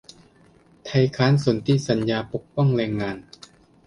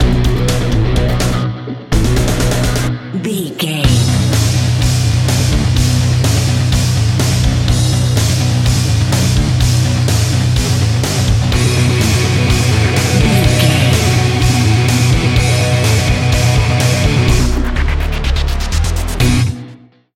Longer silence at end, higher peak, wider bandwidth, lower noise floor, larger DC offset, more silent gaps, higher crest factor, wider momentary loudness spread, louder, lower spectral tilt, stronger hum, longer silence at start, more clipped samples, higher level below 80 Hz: first, 0.65 s vs 0.4 s; second, -4 dBFS vs 0 dBFS; second, 11 kHz vs 16 kHz; first, -55 dBFS vs -38 dBFS; neither; neither; first, 18 dB vs 12 dB; first, 11 LU vs 5 LU; second, -22 LUFS vs -13 LUFS; first, -7 dB/octave vs -5 dB/octave; neither; first, 0.85 s vs 0 s; neither; second, -54 dBFS vs -20 dBFS